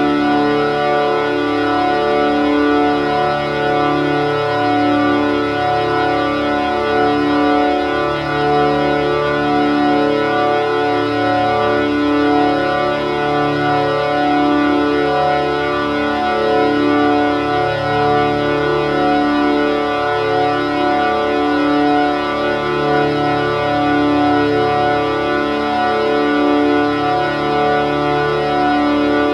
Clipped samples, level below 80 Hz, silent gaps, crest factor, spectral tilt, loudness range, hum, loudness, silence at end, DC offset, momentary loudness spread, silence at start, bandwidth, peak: under 0.1%; -42 dBFS; none; 14 dB; -6.5 dB/octave; 1 LU; none; -15 LUFS; 0 s; under 0.1%; 3 LU; 0 s; 9.6 kHz; -2 dBFS